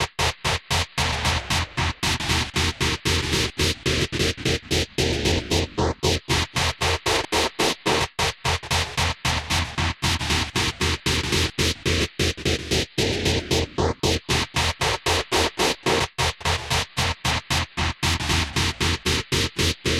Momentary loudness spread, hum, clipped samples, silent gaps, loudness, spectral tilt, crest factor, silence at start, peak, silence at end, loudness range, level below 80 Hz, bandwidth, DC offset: 3 LU; none; under 0.1%; none; -22 LUFS; -3.5 dB/octave; 16 dB; 0 s; -6 dBFS; 0 s; 1 LU; -36 dBFS; 16.5 kHz; under 0.1%